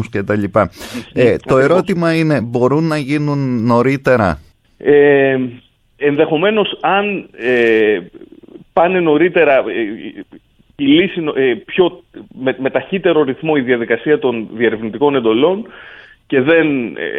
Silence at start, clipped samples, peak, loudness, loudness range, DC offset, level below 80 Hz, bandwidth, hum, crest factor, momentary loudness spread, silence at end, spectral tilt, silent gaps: 0 s; under 0.1%; 0 dBFS; -14 LUFS; 2 LU; under 0.1%; -48 dBFS; 12.5 kHz; none; 14 dB; 9 LU; 0 s; -7 dB/octave; none